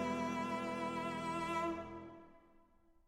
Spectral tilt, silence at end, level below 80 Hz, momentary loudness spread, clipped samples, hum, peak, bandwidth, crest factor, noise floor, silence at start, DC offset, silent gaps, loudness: -5.5 dB/octave; 0.7 s; -68 dBFS; 14 LU; under 0.1%; none; -26 dBFS; 16 kHz; 16 dB; -68 dBFS; 0 s; under 0.1%; none; -40 LUFS